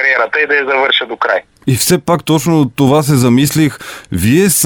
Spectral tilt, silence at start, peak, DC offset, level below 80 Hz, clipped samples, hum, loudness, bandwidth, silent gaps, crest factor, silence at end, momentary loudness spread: -4.5 dB/octave; 0 s; 0 dBFS; under 0.1%; -42 dBFS; under 0.1%; none; -12 LUFS; over 20 kHz; none; 12 dB; 0 s; 6 LU